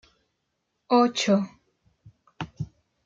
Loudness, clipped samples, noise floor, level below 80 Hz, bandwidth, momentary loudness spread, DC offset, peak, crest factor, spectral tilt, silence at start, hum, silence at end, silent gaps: -24 LUFS; under 0.1%; -78 dBFS; -62 dBFS; 9 kHz; 18 LU; under 0.1%; -8 dBFS; 20 dB; -5 dB/octave; 0.9 s; none; 0.4 s; none